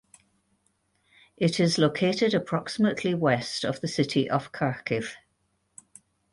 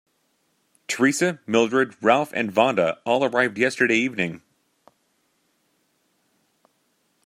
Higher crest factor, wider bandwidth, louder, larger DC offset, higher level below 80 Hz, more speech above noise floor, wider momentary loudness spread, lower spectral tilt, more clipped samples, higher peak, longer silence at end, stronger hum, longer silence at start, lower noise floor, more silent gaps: about the same, 20 dB vs 22 dB; second, 11.5 kHz vs 15.5 kHz; second, -26 LUFS vs -21 LUFS; neither; first, -64 dBFS vs -70 dBFS; about the same, 47 dB vs 48 dB; about the same, 7 LU vs 8 LU; first, -5.5 dB/octave vs -4 dB/octave; neither; second, -8 dBFS vs -2 dBFS; second, 1.15 s vs 2.9 s; neither; first, 1.4 s vs 0.9 s; first, -73 dBFS vs -69 dBFS; neither